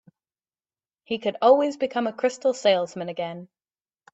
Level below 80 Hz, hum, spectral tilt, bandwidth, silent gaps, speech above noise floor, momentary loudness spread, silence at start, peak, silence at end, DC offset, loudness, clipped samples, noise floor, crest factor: -72 dBFS; none; -4.5 dB/octave; 8.2 kHz; none; over 67 dB; 13 LU; 1.1 s; -4 dBFS; 0.7 s; under 0.1%; -24 LUFS; under 0.1%; under -90 dBFS; 20 dB